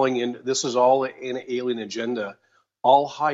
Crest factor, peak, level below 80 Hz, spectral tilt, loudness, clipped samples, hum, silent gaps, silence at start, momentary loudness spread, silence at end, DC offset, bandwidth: 18 dB; -4 dBFS; -78 dBFS; -3.5 dB/octave; -23 LUFS; under 0.1%; none; none; 0 s; 10 LU; 0 s; under 0.1%; 8 kHz